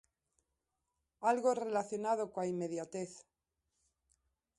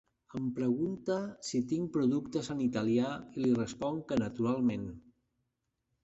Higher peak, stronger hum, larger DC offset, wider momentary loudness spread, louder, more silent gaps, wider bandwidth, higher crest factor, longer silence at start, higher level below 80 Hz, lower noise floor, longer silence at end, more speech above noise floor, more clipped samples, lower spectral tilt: about the same, -20 dBFS vs -18 dBFS; neither; neither; first, 11 LU vs 6 LU; second, -36 LUFS vs -33 LUFS; neither; first, 11.5 kHz vs 8.2 kHz; about the same, 20 dB vs 16 dB; first, 1.2 s vs 0.35 s; second, -82 dBFS vs -64 dBFS; first, -87 dBFS vs -83 dBFS; first, 1.35 s vs 1.05 s; about the same, 51 dB vs 51 dB; neither; about the same, -5.5 dB/octave vs -6.5 dB/octave